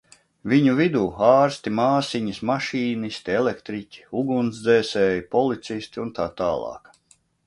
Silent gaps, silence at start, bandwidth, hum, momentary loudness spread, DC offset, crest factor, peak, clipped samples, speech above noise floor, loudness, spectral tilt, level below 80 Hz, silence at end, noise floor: none; 0.45 s; 11.5 kHz; none; 13 LU; under 0.1%; 20 dB; -2 dBFS; under 0.1%; 39 dB; -22 LUFS; -6 dB/octave; -56 dBFS; 0.7 s; -61 dBFS